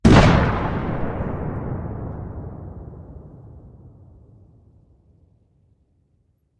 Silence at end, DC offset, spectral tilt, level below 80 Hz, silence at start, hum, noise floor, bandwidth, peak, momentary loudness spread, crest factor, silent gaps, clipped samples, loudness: 2.7 s; under 0.1%; -7 dB/octave; -32 dBFS; 0.05 s; none; -64 dBFS; 11 kHz; 0 dBFS; 27 LU; 22 dB; none; under 0.1%; -21 LUFS